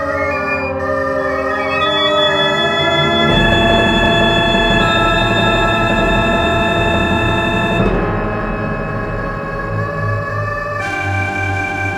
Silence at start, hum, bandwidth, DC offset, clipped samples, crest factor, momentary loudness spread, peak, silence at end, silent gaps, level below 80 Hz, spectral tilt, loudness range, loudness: 0 s; none; 15.5 kHz; under 0.1%; under 0.1%; 14 dB; 8 LU; 0 dBFS; 0 s; none; -28 dBFS; -5.5 dB/octave; 7 LU; -14 LUFS